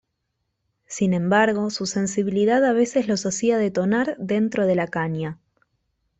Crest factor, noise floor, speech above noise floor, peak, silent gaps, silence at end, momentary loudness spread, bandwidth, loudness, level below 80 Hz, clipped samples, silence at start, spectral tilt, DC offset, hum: 18 dB; -76 dBFS; 55 dB; -6 dBFS; none; 0.85 s; 7 LU; 8.4 kHz; -22 LUFS; -62 dBFS; under 0.1%; 0.9 s; -5.5 dB/octave; under 0.1%; none